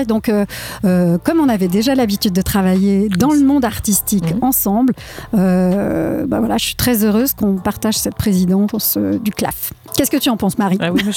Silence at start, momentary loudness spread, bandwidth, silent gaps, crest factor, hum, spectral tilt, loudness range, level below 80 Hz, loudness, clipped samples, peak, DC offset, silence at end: 0 s; 5 LU; 18 kHz; none; 14 dB; none; -5 dB/octave; 2 LU; -38 dBFS; -15 LUFS; under 0.1%; 0 dBFS; under 0.1%; 0 s